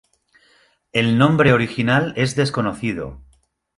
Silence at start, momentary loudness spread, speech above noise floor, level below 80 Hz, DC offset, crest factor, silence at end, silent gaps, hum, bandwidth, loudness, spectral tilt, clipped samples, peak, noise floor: 0.95 s; 11 LU; 40 dB; -48 dBFS; under 0.1%; 18 dB; 0.6 s; none; none; 11.5 kHz; -18 LUFS; -6 dB/octave; under 0.1%; -2 dBFS; -58 dBFS